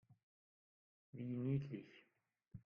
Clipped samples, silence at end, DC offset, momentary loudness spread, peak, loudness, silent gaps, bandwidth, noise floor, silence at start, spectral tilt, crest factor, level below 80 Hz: under 0.1%; 0.05 s; under 0.1%; 21 LU; -30 dBFS; -45 LUFS; 0.23-1.13 s; 5.2 kHz; -85 dBFS; 0.1 s; -10 dB/octave; 20 dB; -78 dBFS